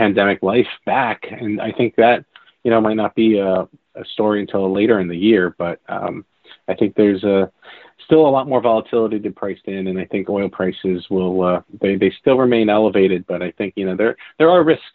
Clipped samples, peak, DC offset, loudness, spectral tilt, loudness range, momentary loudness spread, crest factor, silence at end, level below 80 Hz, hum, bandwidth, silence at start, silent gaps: under 0.1%; 0 dBFS; under 0.1%; -17 LUFS; -5 dB/octave; 2 LU; 11 LU; 16 dB; 0.05 s; -56 dBFS; none; 4.4 kHz; 0 s; none